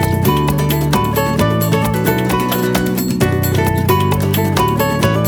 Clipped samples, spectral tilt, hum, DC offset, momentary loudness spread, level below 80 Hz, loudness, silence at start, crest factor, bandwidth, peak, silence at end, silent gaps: under 0.1%; -6 dB/octave; none; under 0.1%; 1 LU; -32 dBFS; -15 LUFS; 0 s; 14 dB; over 20 kHz; 0 dBFS; 0 s; none